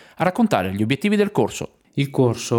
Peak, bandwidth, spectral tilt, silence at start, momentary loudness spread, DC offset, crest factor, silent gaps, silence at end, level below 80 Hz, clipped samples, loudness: -4 dBFS; 18 kHz; -6 dB/octave; 0.2 s; 7 LU; under 0.1%; 18 dB; none; 0 s; -58 dBFS; under 0.1%; -21 LUFS